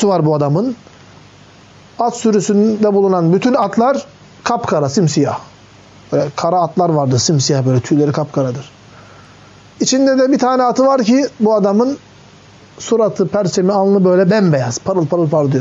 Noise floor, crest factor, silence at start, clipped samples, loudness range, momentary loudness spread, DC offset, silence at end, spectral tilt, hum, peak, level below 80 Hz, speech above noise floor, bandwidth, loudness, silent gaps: -42 dBFS; 12 dB; 0 s; under 0.1%; 2 LU; 7 LU; under 0.1%; 0 s; -6 dB/octave; none; -2 dBFS; -58 dBFS; 29 dB; 8 kHz; -14 LUFS; none